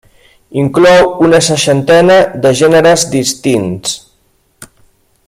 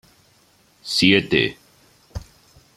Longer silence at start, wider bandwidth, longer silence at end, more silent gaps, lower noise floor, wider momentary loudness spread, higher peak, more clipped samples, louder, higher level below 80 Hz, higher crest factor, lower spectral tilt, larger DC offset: second, 0.5 s vs 0.85 s; about the same, 15 kHz vs 15 kHz; about the same, 0.65 s vs 0.55 s; neither; about the same, -54 dBFS vs -57 dBFS; second, 11 LU vs 23 LU; about the same, 0 dBFS vs -2 dBFS; neither; first, -9 LUFS vs -18 LUFS; about the same, -44 dBFS vs -48 dBFS; second, 10 dB vs 22 dB; about the same, -4.5 dB/octave vs -4.5 dB/octave; neither